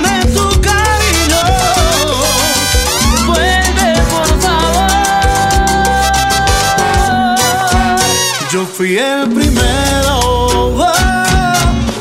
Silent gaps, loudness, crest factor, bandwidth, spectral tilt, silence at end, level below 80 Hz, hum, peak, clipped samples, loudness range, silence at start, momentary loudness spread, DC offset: none; -11 LUFS; 10 dB; 16.5 kHz; -3.5 dB/octave; 0 s; -18 dBFS; none; 0 dBFS; under 0.1%; 1 LU; 0 s; 2 LU; under 0.1%